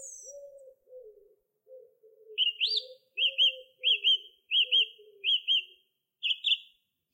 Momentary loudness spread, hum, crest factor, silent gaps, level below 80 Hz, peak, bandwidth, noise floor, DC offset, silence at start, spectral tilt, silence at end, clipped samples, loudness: 13 LU; none; 16 dB; none; -90 dBFS; -16 dBFS; 16 kHz; -68 dBFS; under 0.1%; 0 s; 4.5 dB/octave; 0.5 s; under 0.1%; -26 LUFS